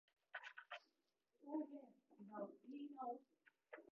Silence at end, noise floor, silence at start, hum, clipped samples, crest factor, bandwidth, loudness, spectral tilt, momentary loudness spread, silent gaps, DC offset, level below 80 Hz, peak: 0.05 s; -89 dBFS; 0.35 s; none; under 0.1%; 20 dB; 6 kHz; -55 LUFS; -3 dB/octave; 13 LU; none; under 0.1%; under -90 dBFS; -36 dBFS